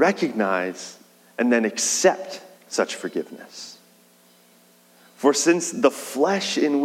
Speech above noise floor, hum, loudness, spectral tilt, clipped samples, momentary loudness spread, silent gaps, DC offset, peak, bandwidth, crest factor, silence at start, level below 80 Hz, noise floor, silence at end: 33 dB; 60 Hz at -55 dBFS; -22 LUFS; -3 dB/octave; under 0.1%; 19 LU; none; under 0.1%; -2 dBFS; 16.5 kHz; 20 dB; 0 s; -88 dBFS; -55 dBFS; 0 s